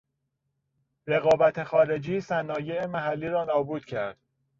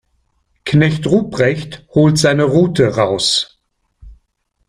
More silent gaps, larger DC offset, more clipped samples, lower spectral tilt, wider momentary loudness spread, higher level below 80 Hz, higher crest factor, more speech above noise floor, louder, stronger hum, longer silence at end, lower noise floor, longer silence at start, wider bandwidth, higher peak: neither; neither; neither; first, -7 dB/octave vs -5.5 dB/octave; first, 11 LU vs 7 LU; second, -64 dBFS vs -46 dBFS; about the same, 18 dB vs 14 dB; about the same, 53 dB vs 52 dB; second, -26 LUFS vs -14 LUFS; neither; about the same, 0.5 s vs 0.55 s; first, -79 dBFS vs -66 dBFS; first, 1.05 s vs 0.65 s; second, 7.6 kHz vs 14.5 kHz; second, -10 dBFS vs 0 dBFS